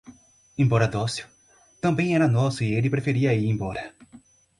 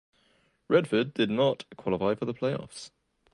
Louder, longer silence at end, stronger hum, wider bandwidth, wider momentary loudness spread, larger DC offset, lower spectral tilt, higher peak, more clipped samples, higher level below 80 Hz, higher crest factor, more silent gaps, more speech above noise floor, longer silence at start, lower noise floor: first, -24 LUFS vs -28 LUFS; about the same, 0.4 s vs 0.45 s; neither; about the same, 11.5 kHz vs 11.5 kHz; second, 12 LU vs 16 LU; neither; about the same, -7 dB/octave vs -6 dB/octave; about the same, -8 dBFS vs -8 dBFS; neither; first, -52 dBFS vs -64 dBFS; about the same, 18 dB vs 20 dB; neither; second, 30 dB vs 40 dB; second, 0.1 s vs 0.7 s; second, -53 dBFS vs -68 dBFS